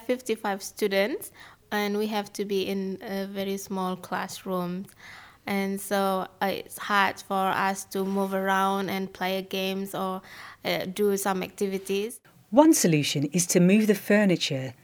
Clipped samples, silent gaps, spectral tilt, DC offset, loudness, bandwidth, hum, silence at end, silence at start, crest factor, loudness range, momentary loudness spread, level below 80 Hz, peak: under 0.1%; none; -4.5 dB/octave; under 0.1%; -26 LUFS; over 20 kHz; none; 0.1 s; 0 s; 24 dB; 8 LU; 12 LU; -68 dBFS; -4 dBFS